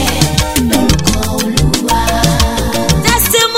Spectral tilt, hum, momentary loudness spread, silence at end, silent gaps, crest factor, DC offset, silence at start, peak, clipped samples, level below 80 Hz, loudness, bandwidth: -4 dB/octave; none; 4 LU; 0 s; none; 12 dB; 5%; 0 s; 0 dBFS; under 0.1%; -20 dBFS; -12 LUFS; 16.5 kHz